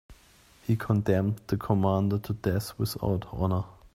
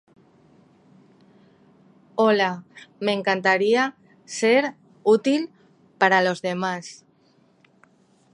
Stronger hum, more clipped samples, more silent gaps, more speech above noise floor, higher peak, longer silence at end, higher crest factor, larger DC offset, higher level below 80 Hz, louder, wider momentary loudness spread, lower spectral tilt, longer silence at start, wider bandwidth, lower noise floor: neither; neither; neither; second, 31 dB vs 39 dB; second, -10 dBFS vs -2 dBFS; second, 0.25 s vs 1.4 s; about the same, 18 dB vs 22 dB; neither; first, -50 dBFS vs -78 dBFS; second, -28 LUFS vs -22 LUFS; second, 7 LU vs 14 LU; first, -7.5 dB/octave vs -4.5 dB/octave; second, 0.1 s vs 2.15 s; first, 16 kHz vs 11.5 kHz; about the same, -58 dBFS vs -60 dBFS